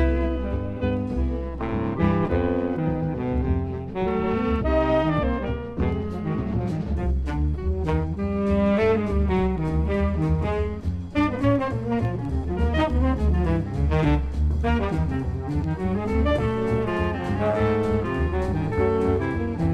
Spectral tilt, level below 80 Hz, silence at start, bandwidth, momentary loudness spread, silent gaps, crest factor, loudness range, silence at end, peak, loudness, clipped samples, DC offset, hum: -9 dB/octave; -28 dBFS; 0 s; 7.8 kHz; 6 LU; none; 14 dB; 2 LU; 0 s; -8 dBFS; -24 LUFS; under 0.1%; under 0.1%; none